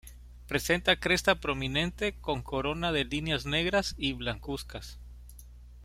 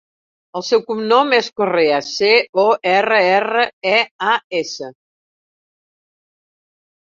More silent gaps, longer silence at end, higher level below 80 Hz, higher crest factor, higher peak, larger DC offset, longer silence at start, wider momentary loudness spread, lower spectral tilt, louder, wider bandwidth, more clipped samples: second, none vs 2.49-2.53 s, 3.73-3.81 s, 4.11-4.19 s, 4.44-4.50 s; second, 0 s vs 2.1 s; first, -46 dBFS vs -66 dBFS; first, 22 dB vs 16 dB; second, -10 dBFS vs -2 dBFS; neither; second, 0.05 s vs 0.55 s; first, 14 LU vs 11 LU; about the same, -4 dB/octave vs -3.5 dB/octave; second, -29 LUFS vs -16 LUFS; first, 16 kHz vs 7.6 kHz; neither